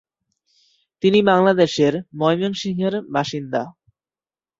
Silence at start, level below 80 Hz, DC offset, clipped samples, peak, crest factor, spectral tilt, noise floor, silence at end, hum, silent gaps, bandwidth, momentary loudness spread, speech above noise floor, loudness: 1.05 s; -62 dBFS; under 0.1%; under 0.1%; -2 dBFS; 18 dB; -6 dB/octave; under -90 dBFS; 0.9 s; none; none; 7.8 kHz; 10 LU; over 72 dB; -19 LUFS